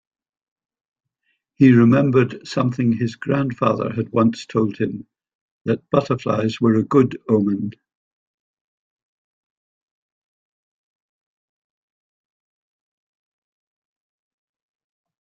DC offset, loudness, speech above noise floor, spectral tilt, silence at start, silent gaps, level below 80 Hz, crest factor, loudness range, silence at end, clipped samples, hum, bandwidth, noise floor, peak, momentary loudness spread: under 0.1%; -19 LUFS; 54 dB; -8 dB/octave; 1.6 s; 5.35-5.65 s; -58 dBFS; 20 dB; 6 LU; 7.5 s; under 0.1%; none; 7.6 kHz; -72 dBFS; -2 dBFS; 11 LU